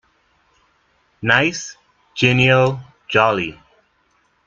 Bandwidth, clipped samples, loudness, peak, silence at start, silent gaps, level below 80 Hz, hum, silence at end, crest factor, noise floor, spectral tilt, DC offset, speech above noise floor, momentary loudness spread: 7.4 kHz; under 0.1%; -16 LUFS; 0 dBFS; 1.2 s; none; -54 dBFS; none; 0.95 s; 20 dB; -62 dBFS; -5 dB/octave; under 0.1%; 46 dB; 18 LU